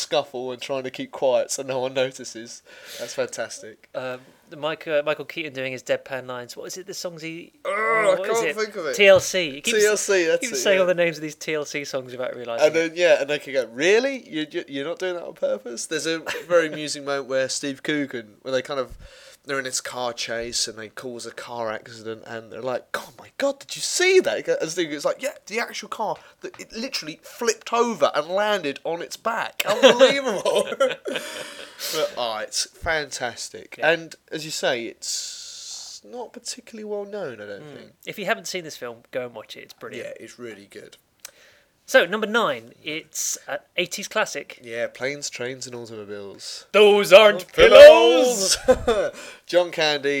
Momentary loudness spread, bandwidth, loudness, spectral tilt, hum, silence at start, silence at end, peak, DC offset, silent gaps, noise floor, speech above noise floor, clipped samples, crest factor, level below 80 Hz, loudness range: 18 LU; 18.5 kHz; -21 LUFS; -2.5 dB/octave; none; 0 s; 0 s; 0 dBFS; under 0.1%; none; -56 dBFS; 34 dB; under 0.1%; 22 dB; -54 dBFS; 15 LU